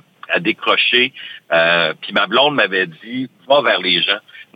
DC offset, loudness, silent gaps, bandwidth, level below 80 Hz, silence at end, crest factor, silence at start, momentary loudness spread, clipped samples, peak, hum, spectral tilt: under 0.1%; -15 LUFS; none; 8.8 kHz; -64 dBFS; 0.15 s; 16 dB; 0.3 s; 9 LU; under 0.1%; -2 dBFS; none; -5.5 dB/octave